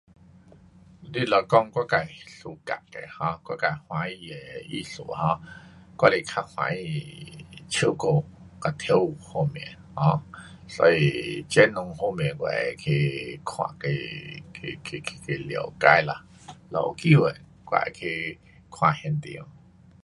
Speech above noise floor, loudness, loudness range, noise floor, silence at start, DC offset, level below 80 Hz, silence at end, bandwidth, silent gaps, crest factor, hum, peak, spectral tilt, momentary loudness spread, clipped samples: 27 dB; -25 LUFS; 6 LU; -52 dBFS; 1 s; under 0.1%; -56 dBFS; 0.55 s; 11.5 kHz; none; 26 dB; none; 0 dBFS; -6 dB/octave; 19 LU; under 0.1%